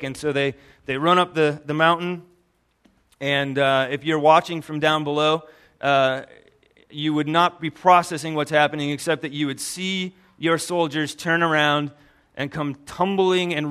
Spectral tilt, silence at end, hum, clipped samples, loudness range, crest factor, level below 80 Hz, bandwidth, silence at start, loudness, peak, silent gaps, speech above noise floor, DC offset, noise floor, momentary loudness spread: -4.5 dB/octave; 0 s; none; under 0.1%; 2 LU; 20 dB; -62 dBFS; 14 kHz; 0 s; -21 LUFS; -2 dBFS; none; 44 dB; under 0.1%; -65 dBFS; 12 LU